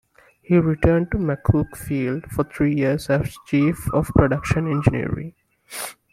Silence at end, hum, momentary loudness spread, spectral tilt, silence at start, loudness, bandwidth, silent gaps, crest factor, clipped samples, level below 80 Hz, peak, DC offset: 0.2 s; none; 11 LU; -7.5 dB/octave; 0.5 s; -21 LUFS; 16 kHz; none; 18 dB; under 0.1%; -38 dBFS; -2 dBFS; under 0.1%